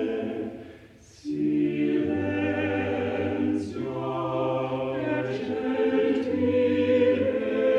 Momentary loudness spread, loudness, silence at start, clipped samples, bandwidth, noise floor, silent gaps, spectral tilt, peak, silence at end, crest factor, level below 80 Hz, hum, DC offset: 9 LU; -26 LUFS; 0 s; under 0.1%; 8.4 kHz; -50 dBFS; none; -7.5 dB/octave; -12 dBFS; 0 s; 14 dB; -60 dBFS; none; under 0.1%